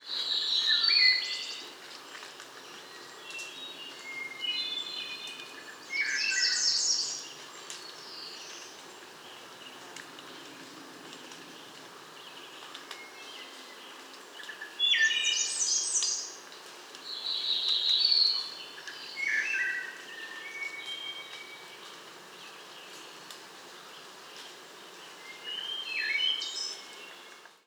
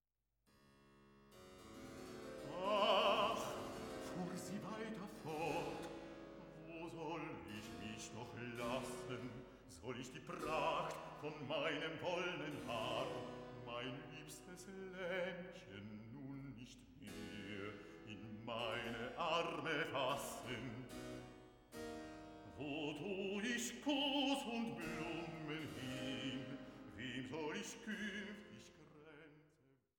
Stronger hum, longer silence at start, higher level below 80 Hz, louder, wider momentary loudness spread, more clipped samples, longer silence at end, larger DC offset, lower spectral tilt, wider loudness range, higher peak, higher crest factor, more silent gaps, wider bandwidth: neither; second, 0 s vs 0.65 s; second, under -90 dBFS vs -70 dBFS; first, -28 LUFS vs -45 LUFS; first, 22 LU vs 16 LU; neither; second, 0.1 s vs 0.5 s; neither; second, 2.5 dB/octave vs -4 dB/octave; first, 18 LU vs 8 LU; first, -12 dBFS vs -22 dBFS; about the same, 24 dB vs 24 dB; neither; first, over 20 kHz vs 17 kHz